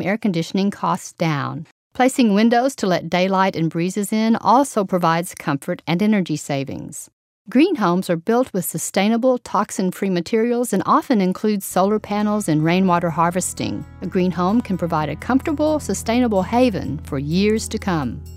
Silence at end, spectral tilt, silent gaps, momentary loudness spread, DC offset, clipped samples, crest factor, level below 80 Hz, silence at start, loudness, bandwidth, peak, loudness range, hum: 0 s; -5.5 dB/octave; 1.71-1.91 s, 7.13-7.45 s; 8 LU; under 0.1%; under 0.1%; 16 dB; -46 dBFS; 0 s; -19 LUFS; 16 kHz; -2 dBFS; 2 LU; none